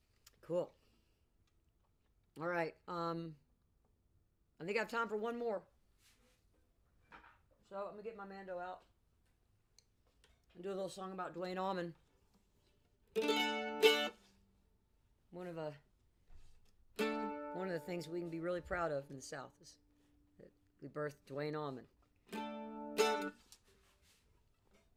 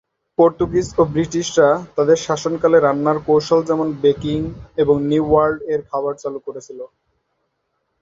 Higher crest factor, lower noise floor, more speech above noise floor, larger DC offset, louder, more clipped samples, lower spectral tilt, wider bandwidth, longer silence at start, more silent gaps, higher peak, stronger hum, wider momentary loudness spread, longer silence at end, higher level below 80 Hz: first, 28 dB vs 16 dB; first, -76 dBFS vs -71 dBFS; second, 35 dB vs 54 dB; neither; second, -41 LUFS vs -17 LUFS; neither; second, -4 dB/octave vs -6 dB/octave; first, 16 kHz vs 7.8 kHz; about the same, 0.45 s vs 0.4 s; neither; second, -16 dBFS vs -2 dBFS; neither; first, 15 LU vs 12 LU; first, 1.4 s vs 1.15 s; second, -72 dBFS vs -46 dBFS